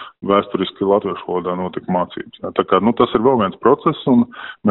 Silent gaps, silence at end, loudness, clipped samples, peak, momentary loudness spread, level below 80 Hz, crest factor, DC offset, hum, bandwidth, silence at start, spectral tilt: none; 0 s; -18 LUFS; under 0.1%; -2 dBFS; 8 LU; -52 dBFS; 16 dB; under 0.1%; none; 4.1 kHz; 0 s; -5.5 dB/octave